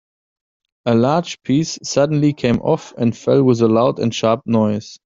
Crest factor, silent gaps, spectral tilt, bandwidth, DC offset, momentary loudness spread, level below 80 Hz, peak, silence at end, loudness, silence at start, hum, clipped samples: 16 dB; none; -6.5 dB/octave; 7.8 kHz; under 0.1%; 6 LU; -52 dBFS; -2 dBFS; 0.1 s; -17 LUFS; 0.85 s; none; under 0.1%